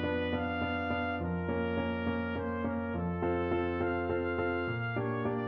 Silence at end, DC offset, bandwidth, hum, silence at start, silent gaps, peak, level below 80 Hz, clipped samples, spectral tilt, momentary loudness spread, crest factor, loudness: 0 s; under 0.1%; 5.6 kHz; none; 0 s; none; -20 dBFS; -52 dBFS; under 0.1%; -6 dB/octave; 2 LU; 12 dB; -33 LUFS